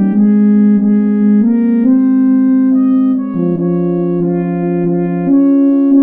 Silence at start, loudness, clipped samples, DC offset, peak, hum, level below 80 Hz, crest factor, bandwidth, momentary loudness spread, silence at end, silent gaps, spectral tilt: 0 s; -11 LUFS; under 0.1%; under 0.1%; 0 dBFS; none; -58 dBFS; 10 dB; 2.9 kHz; 6 LU; 0 s; none; -13 dB/octave